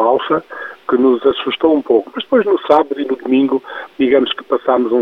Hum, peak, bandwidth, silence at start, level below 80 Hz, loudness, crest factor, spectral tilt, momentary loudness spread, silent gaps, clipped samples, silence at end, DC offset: none; 0 dBFS; 5.4 kHz; 0 s; -58 dBFS; -15 LUFS; 14 dB; -7 dB/octave; 7 LU; none; under 0.1%; 0 s; under 0.1%